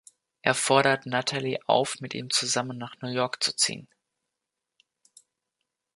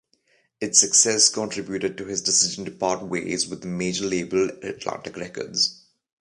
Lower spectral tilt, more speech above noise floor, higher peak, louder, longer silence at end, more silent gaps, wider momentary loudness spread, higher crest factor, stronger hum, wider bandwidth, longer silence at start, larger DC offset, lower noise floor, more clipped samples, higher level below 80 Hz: about the same, -2.5 dB/octave vs -1.5 dB/octave; first, 59 dB vs 41 dB; about the same, -4 dBFS vs -2 dBFS; second, -26 LUFS vs -22 LUFS; first, 2.15 s vs 0.45 s; neither; second, 12 LU vs 15 LU; about the same, 26 dB vs 24 dB; neither; about the same, 12 kHz vs 11.5 kHz; second, 0.45 s vs 0.6 s; neither; first, -86 dBFS vs -65 dBFS; neither; second, -74 dBFS vs -60 dBFS